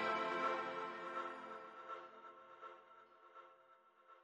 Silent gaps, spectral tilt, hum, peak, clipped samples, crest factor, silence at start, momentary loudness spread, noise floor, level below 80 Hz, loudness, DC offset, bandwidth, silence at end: none; -4 dB/octave; none; -26 dBFS; under 0.1%; 20 dB; 0 s; 23 LU; -69 dBFS; under -90 dBFS; -44 LUFS; under 0.1%; 10 kHz; 0 s